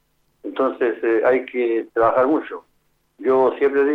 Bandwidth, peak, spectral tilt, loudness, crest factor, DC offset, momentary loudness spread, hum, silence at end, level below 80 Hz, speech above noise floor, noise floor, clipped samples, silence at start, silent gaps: 4.3 kHz; -4 dBFS; -7.5 dB/octave; -19 LUFS; 16 dB; under 0.1%; 14 LU; none; 0 s; -62 dBFS; 46 dB; -65 dBFS; under 0.1%; 0.45 s; none